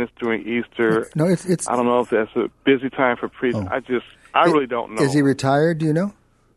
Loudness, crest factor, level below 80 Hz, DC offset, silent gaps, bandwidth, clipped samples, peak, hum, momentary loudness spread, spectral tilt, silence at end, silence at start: -20 LUFS; 18 dB; -56 dBFS; under 0.1%; none; 12.5 kHz; under 0.1%; -2 dBFS; none; 7 LU; -6 dB/octave; 0.45 s; 0 s